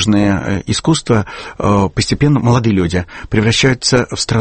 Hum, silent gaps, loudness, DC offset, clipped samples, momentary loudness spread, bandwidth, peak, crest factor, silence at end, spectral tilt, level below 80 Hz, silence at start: none; none; -14 LUFS; under 0.1%; under 0.1%; 6 LU; 8.8 kHz; 0 dBFS; 14 dB; 0 s; -5 dB/octave; -34 dBFS; 0 s